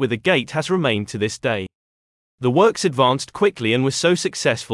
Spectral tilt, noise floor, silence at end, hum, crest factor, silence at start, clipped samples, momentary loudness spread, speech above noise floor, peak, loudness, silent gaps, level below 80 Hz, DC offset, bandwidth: -4.5 dB/octave; under -90 dBFS; 0 s; none; 18 dB; 0 s; under 0.1%; 7 LU; over 71 dB; -2 dBFS; -19 LUFS; 1.75-2.38 s; -60 dBFS; under 0.1%; 12 kHz